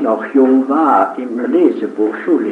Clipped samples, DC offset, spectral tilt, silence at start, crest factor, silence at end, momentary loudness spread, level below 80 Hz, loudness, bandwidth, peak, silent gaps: under 0.1%; under 0.1%; -7.5 dB/octave; 0 s; 14 dB; 0 s; 6 LU; -76 dBFS; -14 LUFS; 4.3 kHz; 0 dBFS; none